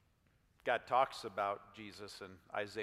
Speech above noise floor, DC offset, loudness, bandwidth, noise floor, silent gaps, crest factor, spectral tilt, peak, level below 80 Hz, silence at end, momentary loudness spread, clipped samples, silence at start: 34 dB; under 0.1%; -38 LUFS; 15.5 kHz; -73 dBFS; none; 22 dB; -4 dB/octave; -18 dBFS; -76 dBFS; 0 s; 16 LU; under 0.1%; 0.65 s